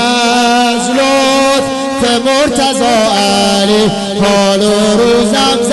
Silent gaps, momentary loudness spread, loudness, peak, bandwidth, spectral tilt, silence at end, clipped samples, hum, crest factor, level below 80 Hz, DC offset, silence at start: none; 3 LU; -10 LUFS; -4 dBFS; 12 kHz; -3.5 dB/octave; 0 s; under 0.1%; none; 6 dB; -38 dBFS; under 0.1%; 0 s